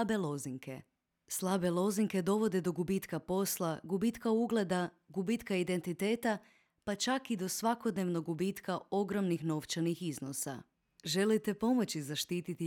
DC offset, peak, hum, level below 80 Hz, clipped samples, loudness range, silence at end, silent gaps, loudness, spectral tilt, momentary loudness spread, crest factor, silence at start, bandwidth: under 0.1%; -20 dBFS; none; -70 dBFS; under 0.1%; 2 LU; 0 s; none; -35 LUFS; -5 dB/octave; 8 LU; 14 dB; 0 s; 19 kHz